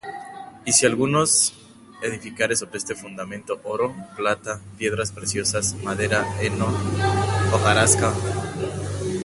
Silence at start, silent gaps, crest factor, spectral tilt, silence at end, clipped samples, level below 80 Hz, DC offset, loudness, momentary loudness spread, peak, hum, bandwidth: 0.05 s; none; 22 dB; -3.5 dB/octave; 0 s; under 0.1%; -42 dBFS; under 0.1%; -22 LUFS; 14 LU; -2 dBFS; none; 12 kHz